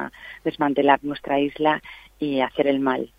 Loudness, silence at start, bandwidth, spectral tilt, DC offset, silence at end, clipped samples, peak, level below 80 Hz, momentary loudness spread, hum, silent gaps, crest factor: -22 LUFS; 0 s; 5.2 kHz; -7 dB/octave; under 0.1%; 0.1 s; under 0.1%; -2 dBFS; -56 dBFS; 11 LU; none; none; 22 dB